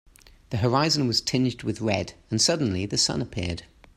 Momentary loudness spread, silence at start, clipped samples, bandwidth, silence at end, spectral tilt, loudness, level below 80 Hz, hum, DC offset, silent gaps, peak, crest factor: 10 LU; 0.5 s; under 0.1%; 15.5 kHz; 0.35 s; -4 dB/octave; -24 LUFS; -52 dBFS; none; under 0.1%; none; -8 dBFS; 18 dB